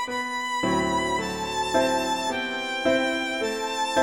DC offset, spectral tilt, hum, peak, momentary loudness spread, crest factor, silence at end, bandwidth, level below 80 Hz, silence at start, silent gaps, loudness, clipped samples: 0.2%; -3 dB/octave; none; -10 dBFS; 5 LU; 16 dB; 0 s; 16.5 kHz; -52 dBFS; 0 s; none; -25 LUFS; under 0.1%